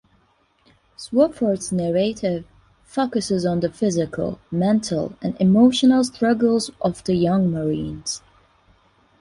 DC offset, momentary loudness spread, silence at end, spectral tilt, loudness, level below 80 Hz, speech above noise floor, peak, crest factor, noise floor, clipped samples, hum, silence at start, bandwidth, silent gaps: under 0.1%; 11 LU; 1.05 s; -6 dB/octave; -21 LUFS; -52 dBFS; 42 dB; -4 dBFS; 16 dB; -62 dBFS; under 0.1%; none; 1 s; 11.5 kHz; none